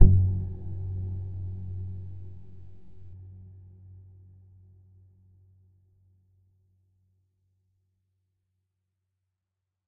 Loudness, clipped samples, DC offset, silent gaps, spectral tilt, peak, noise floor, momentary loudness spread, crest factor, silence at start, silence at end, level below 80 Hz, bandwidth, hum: -31 LUFS; under 0.1%; under 0.1%; none; -14.5 dB/octave; 0 dBFS; -86 dBFS; 24 LU; 30 dB; 0 s; 6.45 s; -36 dBFS; 1 kHz; none